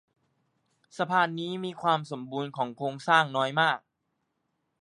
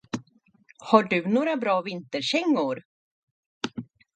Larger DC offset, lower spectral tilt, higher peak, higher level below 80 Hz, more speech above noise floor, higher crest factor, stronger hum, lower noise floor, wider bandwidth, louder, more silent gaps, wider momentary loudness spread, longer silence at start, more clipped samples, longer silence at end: neither; about the same, -5 dB/octave vs -5 dB/octave; second, -8 dBFS vs -4 dBFS; second, -82 dBFS vs -72 dBFS; first, 51 dB vs 36 dB; about the same, 22 dB vs 24 dB; neither; first, -79 dBFS vs -60 dBFS; first, 11 kHz vs 9.2 kHz; second, -28 LUFS vs -25 LUFS; second, none vs 2.85-3.61 s; second, 11 LU vs 16 LU; first, 0.95 s vs 0.15 s; neither; first, 1 s vs 0.3 s